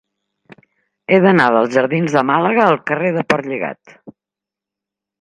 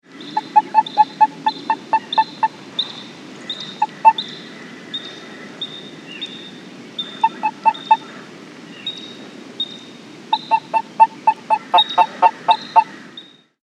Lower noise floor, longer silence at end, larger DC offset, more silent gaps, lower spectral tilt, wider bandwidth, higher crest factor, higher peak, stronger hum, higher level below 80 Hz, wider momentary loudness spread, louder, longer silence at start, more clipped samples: first, -86 dBFS vs -42 dBFS; first, 1.1 s vs 0.45 s; neither; neither; first, -6.5 dB/octave vs -3 dB/octave; first, 10.5 kHz vs 9.4 kHz; about the same, 18 dB vs 20 dB; about the same, 0 dBFS vs 0 dBFS; neither; first, -62 dBFS vs -80 dBFS; second, 12 LU vs 21 LU; first, -15 LUFS vs -19 LUFS; first, 1.1 s vs 0.15 s; neither